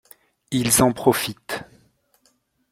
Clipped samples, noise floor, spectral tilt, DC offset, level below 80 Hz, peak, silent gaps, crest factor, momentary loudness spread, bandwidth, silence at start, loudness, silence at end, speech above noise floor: under 0.1%; -65 dBFS; -3.5 dB/octave; under 0.1%; -50 dBFS; -2 dBFS; none; 22 dB; 15 LU; 16.5 kHz; 0.5 s; -21 LUFS; 1.05 s; 45 dB